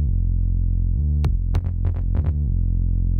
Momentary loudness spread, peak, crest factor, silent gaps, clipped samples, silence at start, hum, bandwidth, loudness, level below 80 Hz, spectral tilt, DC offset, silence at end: 2 LU; -8 dBFS; 12 dB; none; under 0.1%; 0 s; none; 4.3 kHz; -23 LUFS; -22 dBFS; -10 dB/octave; under 0.1%; 0 s